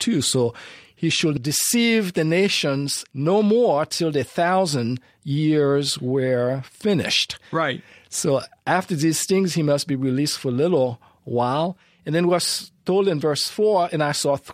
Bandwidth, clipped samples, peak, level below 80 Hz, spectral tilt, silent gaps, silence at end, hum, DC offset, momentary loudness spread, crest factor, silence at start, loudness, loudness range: 16 kHz; under 0.1%; -6 dBFS; -62 dBFS; -4.5 dB/octave; none; 0 s; none; under 0.1%; 7 LU; 16 dB; 0 s; -21 LUFS; 2 LU